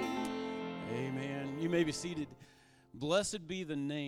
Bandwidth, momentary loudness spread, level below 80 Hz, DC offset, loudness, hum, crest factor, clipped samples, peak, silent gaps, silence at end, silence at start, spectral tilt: 15.5 kHz; 9 LU; -68 dBFS; under 0.1%; -37 LUFS; none; 20 dB; under 0.1%; -18 dBFS; none; 0 s; 0 s; -5 dB/octave